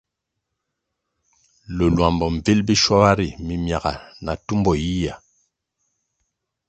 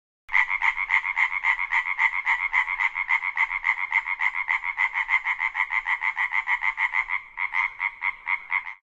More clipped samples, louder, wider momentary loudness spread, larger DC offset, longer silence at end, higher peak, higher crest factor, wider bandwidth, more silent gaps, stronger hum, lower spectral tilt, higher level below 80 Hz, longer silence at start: neither; first, -20 LUFS vs -23 LUFS; first, 13 LU vs 5 LU; neither; first, 1.5 s vs 0.15 s; first, 0 dBFS vs -6 dBFS; about the same, 22 dB vs 18 dB; about the same, 8.8 kHz vs 8.2 kHz; neither; neither; first, -5.5 dB/octave vs 1.5 dB/octave; first, -38 dBFS vs -58 dBFS; first, 1.7 s vs 0.3 s